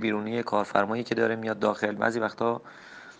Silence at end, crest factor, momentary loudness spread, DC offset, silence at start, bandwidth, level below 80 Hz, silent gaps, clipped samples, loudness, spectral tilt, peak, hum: 0.05 s; 22 dB; 5 LU; under 0.1%; 0 s; 9.4 kHz; -70 dBFS; none; under 0.1%; -28 LUFS; -6 dB/octave; -6 dBFS; none